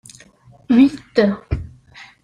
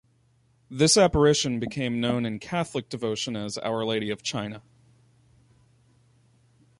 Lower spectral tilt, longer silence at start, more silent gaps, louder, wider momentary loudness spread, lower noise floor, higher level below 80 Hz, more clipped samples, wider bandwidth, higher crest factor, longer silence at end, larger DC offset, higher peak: first, -7 dB/octave vs -4 dB/octave; about the same, 0.7 s vs 0.7 s; neither; first, -17 LUFS vs -25 LUFS; about the same, 14 LU vs 13 LU; second, -48 dBFS vs -64 dBFS; first, -38 dBFS vs -48 dBFS; neither; about the same, 10.5 kHz vs 11.5 kHz; about the same, 16 dB vs 20 dB; second, 0.2 s vs 2.2 s; neither; first, -2 dBFS vs -8 dBFS